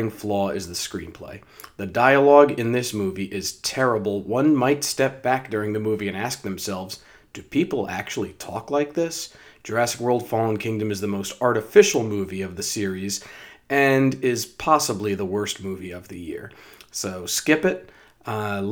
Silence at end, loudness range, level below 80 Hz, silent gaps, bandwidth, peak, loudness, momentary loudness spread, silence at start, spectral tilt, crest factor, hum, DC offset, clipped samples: 0 s; 6 LU; -60 dBFS; none; over 20 kHz; 0 dBFS; -22 LUFS; 17 LU; 0 s; -4.5 dB/octave; 22 dB; none; under 0.1%; under 0.1%